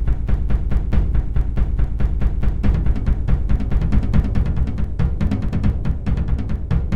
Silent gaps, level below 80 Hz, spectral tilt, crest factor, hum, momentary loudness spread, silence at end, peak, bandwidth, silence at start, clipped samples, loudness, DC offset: none; -20 dBFS; -9.5 dB/octave; 14 dB; none; 3 LU; 0 s; -4 dBFS; 4.7 kHz; 0 s; under 0.1%; -22 LUFS; 4%